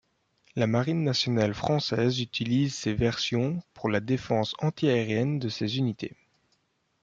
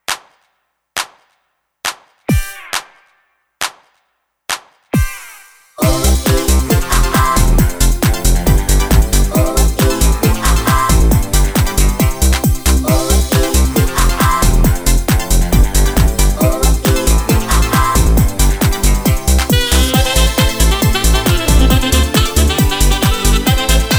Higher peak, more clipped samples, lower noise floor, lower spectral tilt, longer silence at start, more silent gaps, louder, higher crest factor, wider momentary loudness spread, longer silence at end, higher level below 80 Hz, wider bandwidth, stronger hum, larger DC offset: second, -10 dBFS vs 0 dBFS; neither; first, -72 dBFS vs -66 dBFS; first, -6 dB/octave vs -4.5 dB/octave; first, 0.55 s vs 0.1 s; neither; second, -27 LUFS vs -13 LUFS; first, 18 dB vs 12 dB; second, 5 LU vs 10 LU; first, 0.95 s vs 0 s; second, -56 dBFS vs -14 dBFS; second, 7.6 kHz vs over 20 kHz; neither; neither